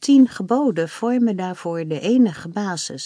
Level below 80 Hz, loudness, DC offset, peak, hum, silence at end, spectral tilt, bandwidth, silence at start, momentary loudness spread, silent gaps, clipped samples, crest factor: -68 dBFS; -20 LUFS; under 0.1%; -4 dBFS; none; 0 s; -5.5 dB/octave; 10.5 kHz; 0 s; 10 LU; none; under 0.1%; 14 dB